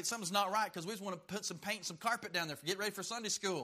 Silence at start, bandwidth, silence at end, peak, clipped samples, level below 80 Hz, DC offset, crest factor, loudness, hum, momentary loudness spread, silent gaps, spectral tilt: 0 s; 15.5 kHz; 0 s; -20 dBFS; under 0.1%; -80 dBFS; under 0.1%; 20 dB; -38 LUFS; none; 8 LU; none; -2 dB/octave